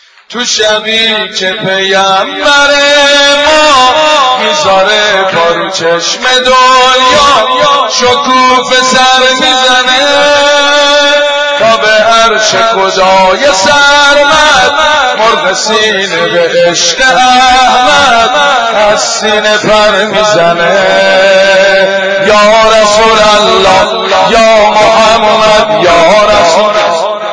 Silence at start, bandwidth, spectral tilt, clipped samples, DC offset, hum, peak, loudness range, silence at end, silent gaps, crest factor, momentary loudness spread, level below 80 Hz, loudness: 0.3 s; 11 kHz; -1.5 dB/octave; 1%; 0.6%; none; 0 dBFS; 1 LU; 0 s; none; 6 dB; 4 LU; -36 dBFS; -5 LUFS